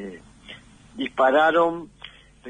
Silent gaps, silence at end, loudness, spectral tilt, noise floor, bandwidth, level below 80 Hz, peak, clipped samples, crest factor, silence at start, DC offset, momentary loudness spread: none; 0 s; -20 LUFS; -5 dB/octave; -46 dBFS; 10 kHz; -58 dBFS; -8 dBFS; under 0.1%; 16 dB; 0 s; under 0.1%; 25 LU